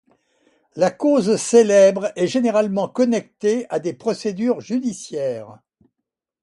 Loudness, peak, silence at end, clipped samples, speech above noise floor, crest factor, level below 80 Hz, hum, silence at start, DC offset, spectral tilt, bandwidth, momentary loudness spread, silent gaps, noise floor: -19 LUFS; -2 dBFS; 0.9 s; under 0.1%; 63 dB; 18 dB; -68 dBFS; none; 0.75 s; under 0.1%; -5 dB/octave; 11.5 kHz; 12 LU; none; -82 dBFS